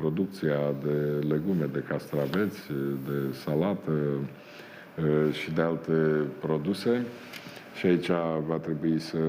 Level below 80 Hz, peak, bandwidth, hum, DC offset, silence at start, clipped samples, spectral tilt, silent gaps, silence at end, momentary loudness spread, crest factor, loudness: -60 dBFS; -12 dBFS; 16 kHz; none; under 0.1%; 0 s; under 0.1%; -7.5 dB/octave; none; 0 s; 12 LU; 16 dB; -29 LUFS